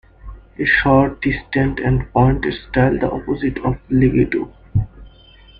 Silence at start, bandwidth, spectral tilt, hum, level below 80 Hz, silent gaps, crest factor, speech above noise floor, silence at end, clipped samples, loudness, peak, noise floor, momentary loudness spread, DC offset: 0.25 s; 5 kHz; -10 dB/octave; none; -32 dBFS; none; 16 dB; 28 dB; 0.5 s; under 0.1%; -18 LUFS; -2 dBFS; -45 dBFS; 8 LU; under 0.1%